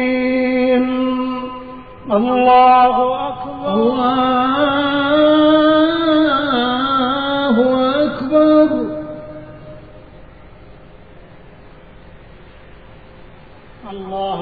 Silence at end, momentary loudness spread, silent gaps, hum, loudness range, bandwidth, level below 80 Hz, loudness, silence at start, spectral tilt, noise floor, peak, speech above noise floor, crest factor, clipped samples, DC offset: 0 s; 18 LU; none; none; 5 LU; 4.9 kHz; -46 dBFS; -14 LUFS; 0 s; -8.5 dB/octave; -41 dBFS; -2 dBFS; 27 dB; 14 dB; under 0.1%; 0.5%